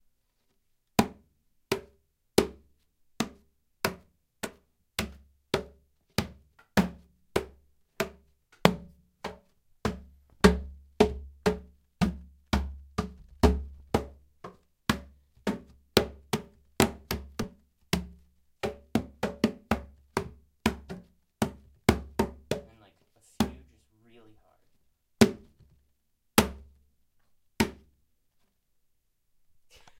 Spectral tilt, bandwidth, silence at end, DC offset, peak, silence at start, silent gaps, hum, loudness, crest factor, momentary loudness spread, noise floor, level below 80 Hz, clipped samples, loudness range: -5 dB/octave; 16 kHz; 2.25 s; under 0.1%; 0 dBFS; 1 s; none; none; -31 LUFS; 32 dB; 17 LU; -73 dBFS; -44 dBFS; under 0.1%; 5 LU